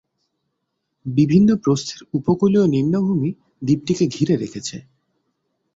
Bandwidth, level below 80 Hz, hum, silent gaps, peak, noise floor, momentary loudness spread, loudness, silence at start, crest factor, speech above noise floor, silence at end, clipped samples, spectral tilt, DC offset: 8 kHz; -54 dBFS; none; none; -4 dBFS; -75 dBFS; 13 LU; -19 LUFS; 1.05 s; 16 dB; 57 dB; 0.95 s; under 0.1%; -7 dB/octave; under 0.1%